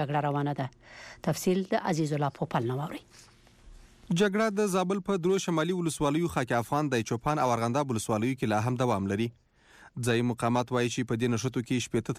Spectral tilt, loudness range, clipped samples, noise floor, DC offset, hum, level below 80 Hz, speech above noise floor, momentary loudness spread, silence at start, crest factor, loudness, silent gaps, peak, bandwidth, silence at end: -5.5 dB/octave; 3 LU; under 0.1%; -57 dBFS; under 0.1%; none; -58 dBFS; 28 dB; 6 LU; 0 s; 14 dB; -29 LUFS; none; -16 dBFS; 15.5 kHz; 0 s